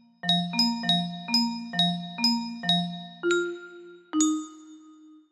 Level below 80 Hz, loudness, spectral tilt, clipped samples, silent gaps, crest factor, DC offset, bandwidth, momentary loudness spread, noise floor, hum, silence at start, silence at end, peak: -74 dBFS; -26 LUFS; -3.5 dB/octave; under 0.1%; none; 18 dB; under 0.1%; 13.5 kHz; 10 LU; -52 dBFS; none; 0.25 s; 0.15 s; -10 dBFS